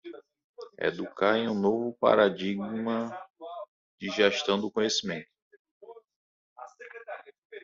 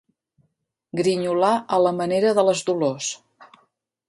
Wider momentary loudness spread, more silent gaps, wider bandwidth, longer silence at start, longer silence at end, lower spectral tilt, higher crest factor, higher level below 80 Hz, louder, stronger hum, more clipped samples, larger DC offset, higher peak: first, 23 LU vs 10 LU; first, 0.44-0.54 s, 3.30-3.34 s, 3.68-3.98 s, 5.42-5.51 s, 5.59-5.65 s, 5.71-5.81 s, 6.16-6.56 s, 7.38-7.50 s vs none; second, 7.6 kHz vs 11.5 kHz; second, 0.05 s vs 0.95 s; second, 0 s vs 0.65 s; second, -3 dB/octave vs -4.5 dB/octave; about the same, 22 dB vs 18 dB; about the same, -72 dBFS vs -68 dBFS; second, -28 LUFS vs -21 LUFS; neither; neither; neither; second, -8 dBFS vs -4 dBFS